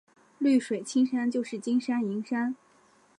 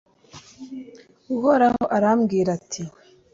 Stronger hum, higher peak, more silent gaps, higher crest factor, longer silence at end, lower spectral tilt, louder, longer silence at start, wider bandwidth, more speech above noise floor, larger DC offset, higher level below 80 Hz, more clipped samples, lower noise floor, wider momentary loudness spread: neither; second, -14 dBFS vs -6 dBFS; neither; about the same, 16 dB vs 18 dB; first, 0.65 s vs 0.45 s; about the same, -5 dB/octave vs -6 dB/octave; second, -28 LUFS vs -21 LUFS; about the same, 0.4 s vs 0.35 s; first, 10.5 kHz vs 7.8 kHz; first, 35 dB vs 28 dB; neither; second, -82 dBFS vs -58 dBFS; neither; first, -62 dBFS vs -47 dBFS; second, 6 LU vs 21 LU